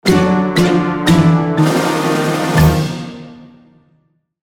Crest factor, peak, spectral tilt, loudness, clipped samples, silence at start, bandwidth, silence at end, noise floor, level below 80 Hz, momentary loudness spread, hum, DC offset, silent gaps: 14 dB; 0 dBFS; -6 dB/octave; -13 LUFS; under 0.1%; 0.05 s; 18 kHz; 0.95 s; -59 dBFS; -32 dBFS; 10 LU; none; under 0.1%; none